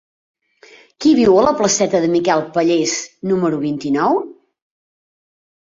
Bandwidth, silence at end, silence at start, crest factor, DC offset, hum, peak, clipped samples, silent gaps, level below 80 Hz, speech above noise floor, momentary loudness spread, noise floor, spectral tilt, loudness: 7.8 kHz; 1.45 s; 1 s; 16 dB; under 0.1%; none; -2 dBFS; under 0.1%; none; -54 dBFS; 32 dB; 9 LU; -47 dBFS; -4.5 dB/octave; -16 LUFS